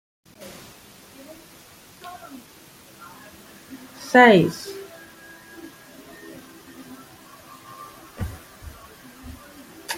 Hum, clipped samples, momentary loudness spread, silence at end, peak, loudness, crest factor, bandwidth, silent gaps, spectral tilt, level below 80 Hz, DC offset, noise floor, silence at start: none; under 0.1%; 26 LU; 0 s; -2 dBFS; -18 LUFS; 24 dB; 16.5 kHz; none; -5 dB/octave; -52 dBFS; under 0.1%; -48 dBFS; 2.05 s